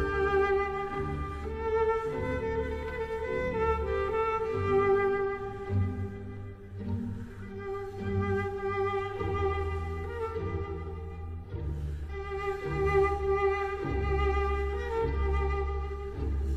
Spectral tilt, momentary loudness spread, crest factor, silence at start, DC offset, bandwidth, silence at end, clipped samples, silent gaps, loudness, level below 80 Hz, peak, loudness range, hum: -8 dB/octave; 11 LU; 16 dB; 0 s; under 0.1%; 8.8 kHz; 0 s; under 0.1%; none; -31 LUFS; -38 dBFS; -16 dBFS; 5 LU; none